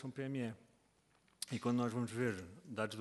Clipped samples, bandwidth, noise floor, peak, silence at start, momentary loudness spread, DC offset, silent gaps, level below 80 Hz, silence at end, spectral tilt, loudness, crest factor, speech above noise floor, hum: under 0.1%; 12 kHz; -74 dBFS; -22 dBFS; 0 s; 11 LU; under 0.1%; none; -78 dBFS; 0 s; -5.5 dB/octave; -41 LUFS; 20 dB; 34 dB; none